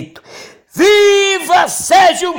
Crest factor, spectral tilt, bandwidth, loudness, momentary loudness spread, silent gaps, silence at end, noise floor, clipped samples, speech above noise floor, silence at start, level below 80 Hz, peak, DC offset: 10 dB; -1.5 dB/octave; 17 kHz; -10 LUFS; 4 LU; none; 0 s; -36 dBFS; under 0.1%; 27 dB; 0 s; -52 dBFS; -2 dBFS; under 0.1%